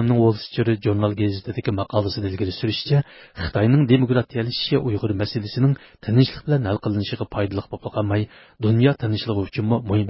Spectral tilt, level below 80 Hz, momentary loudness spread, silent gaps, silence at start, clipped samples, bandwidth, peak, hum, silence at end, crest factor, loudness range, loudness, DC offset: -11.5 dB/octave; -44 dBFS; 8 LU; none; 0 s; under 0.1%; 5.8 kHz; -4 dBFS; none; 0 s; 18 dB; 2 LU; -22 LUFS; under 0.1%